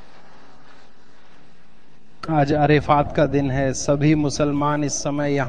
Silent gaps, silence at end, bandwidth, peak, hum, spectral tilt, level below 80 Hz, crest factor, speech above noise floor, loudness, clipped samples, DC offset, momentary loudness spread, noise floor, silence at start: none; 0 s; 10 kHz; -4 dBFS; none; -6 dB/octave; -42 dBFS; 18 dB; 35 dB; -20 LUFS; under 0.1%; 2%; 6 LU; -54 dBFS; 2.25 s